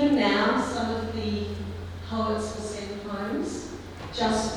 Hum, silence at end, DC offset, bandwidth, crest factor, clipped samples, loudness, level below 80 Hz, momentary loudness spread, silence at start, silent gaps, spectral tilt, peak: none; 0 s; under 0.1%; 13 kHz; 16 dB; under 0.1%; -28 LUFS; -46 dBFS; 14 LU; 0 s; none; -5 dB/octave; -12 dBFS